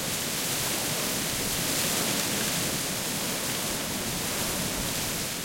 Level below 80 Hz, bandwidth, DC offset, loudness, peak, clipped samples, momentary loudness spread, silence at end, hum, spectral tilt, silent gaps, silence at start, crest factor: -50 dBFS; 16.5 kHz; under 0.1%; -27 LUFS; -14 dBFS; under 0.1%; 3 LU; 0 s; none; -2 dB/octave; none; 0 s; 16 dB